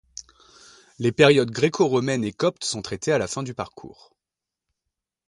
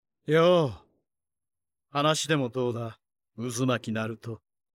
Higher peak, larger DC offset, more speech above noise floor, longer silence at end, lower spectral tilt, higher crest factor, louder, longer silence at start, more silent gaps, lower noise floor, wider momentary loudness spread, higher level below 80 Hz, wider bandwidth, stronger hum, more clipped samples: first, -2 dBFS vs -12 dBFS; neither; first, 66 dB vs 60 dB; first, 1.4 s vs 0.4 s; about the same, -5 dB/octave vs -5 dB/octave; about the same, 22 dB vs 18 dB; first, -22 LUFS vs -27 LUFS; first, 1 s vs 0.3 s; neither; about the same, -88 dBFS vs -86 dBFS; about the same, 17 LU vs 17 LU; first, -58 dBFS vs -68 dBFS; second, 11.5 kHz vs 15.5 kHz; neither; neither